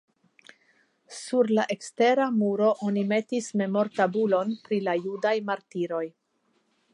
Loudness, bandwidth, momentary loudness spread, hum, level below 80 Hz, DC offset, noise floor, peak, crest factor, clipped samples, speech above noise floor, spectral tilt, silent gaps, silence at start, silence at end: -26 LUFS; 11 kHz; 8 LU; none; -80 dBFS; under 0.1%; -71 dBFS; -10 dBFS; 18 dB; under 0.1%; 46 dB; -5.5 dB/octave; none; 1.1 s; 0.85 s